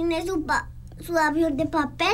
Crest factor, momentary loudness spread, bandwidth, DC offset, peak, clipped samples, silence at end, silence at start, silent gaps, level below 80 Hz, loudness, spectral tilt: 14 dB; 9 LU; 16 kHz; under 0.1%; -10 dBFS; under 0.1%; 0 s; 0 s; none; -42 dBFS; -24 LUFS; -4.5 dB/octave